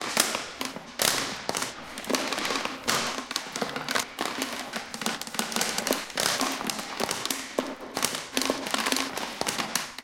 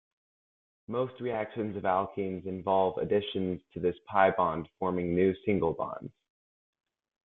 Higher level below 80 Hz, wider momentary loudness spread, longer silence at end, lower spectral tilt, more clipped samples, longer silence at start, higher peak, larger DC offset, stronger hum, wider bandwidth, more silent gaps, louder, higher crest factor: about the same, -62 dBFS vs -64 dBFS; about the same, 7 LU vs 9 LU; second, 0 s vs 1.15 s; second, -1 dB/octave vs -10 dB/octave; neither; second, 0 s vs 0.9 s; first, -2 dBFS vs -10 dBFS; neither; neither; first, 17 kHz vs 4.1 kHz; neither; about the same, -28 LUFS vs -30 LUFS; first, 28 dB vs 22 dB